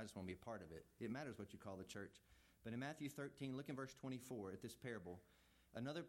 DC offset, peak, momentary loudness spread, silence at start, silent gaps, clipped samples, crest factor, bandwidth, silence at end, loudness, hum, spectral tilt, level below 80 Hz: under 0.1%; -36 dBFS; 8 LU; 0 s; none; under 0.1%; 16 dB; 16.5 kHz; 0 s; -53 LUFS; none; -5.5 dB/octave; -80 dBFS